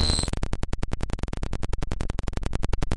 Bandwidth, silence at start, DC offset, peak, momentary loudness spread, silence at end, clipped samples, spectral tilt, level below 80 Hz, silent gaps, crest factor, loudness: 11.5 kHz; 0 s; under 0.1%; -8 dBFS; 6 LU; 0 s; under 0.1%; -4.5 dB/octave; -30 dBFS; none; 18 dB; -31 LUFS